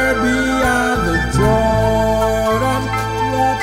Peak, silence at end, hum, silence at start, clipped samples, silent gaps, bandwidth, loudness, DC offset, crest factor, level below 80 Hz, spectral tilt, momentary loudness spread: -2 dBFS; 0 s; none; 0 s; under 0.1%; none; 16 kHz; -16 LUFS; under 0.1%; 12 dB; -26 dBFS; -5.5 dB/octave; 4 LU